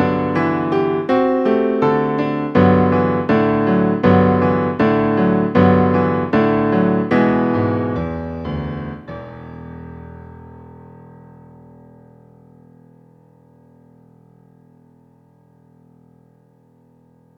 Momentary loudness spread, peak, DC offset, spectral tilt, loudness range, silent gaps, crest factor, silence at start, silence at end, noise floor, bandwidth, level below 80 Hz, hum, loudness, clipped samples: 21 LU; 0 dBFS; under 0.1%; -9.5 dB/octave; 17 LU; none; 18 dB; 0 s; 6.55 s; -53 dBFS; 6 kHz; -46 dBFS; none; -16 LUFS; under 0.1%